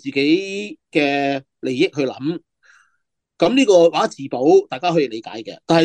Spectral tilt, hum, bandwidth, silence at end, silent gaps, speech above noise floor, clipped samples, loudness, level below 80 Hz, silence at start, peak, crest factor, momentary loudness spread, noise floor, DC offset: -5 dB/octave; none; 9.8 kHz; 0 s; none; 55 dB; under 0.1%; -18 LUFS; -64 dBFS; 0.05 s; -2 dBFS; 16 dB; 14 LU; -72 dBFS; under 0.1%